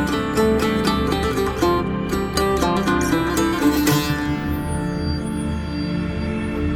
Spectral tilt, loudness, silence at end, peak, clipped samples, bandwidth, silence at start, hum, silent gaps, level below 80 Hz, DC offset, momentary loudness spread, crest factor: -5.5 dB/octave; -21 LUFS; 0 s; -6 dBFS; under 0.1%; 19.5 kHz; 0 s; none; none; -34 dBFS; under 0.1%; 6 LU; 14 dB